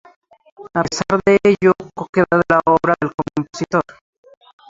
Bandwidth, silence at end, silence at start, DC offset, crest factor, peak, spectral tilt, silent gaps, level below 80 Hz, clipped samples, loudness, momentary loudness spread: 7.8 kHz; 0.9 s; 0.6 s; under 0.1%; 16 dB; -2 dBFS; -6 dB/octave; 2.09-2.13 s, 3.14-3.18 s; -50 dBFS; under 0.1%; -17 LUFS; 10 LU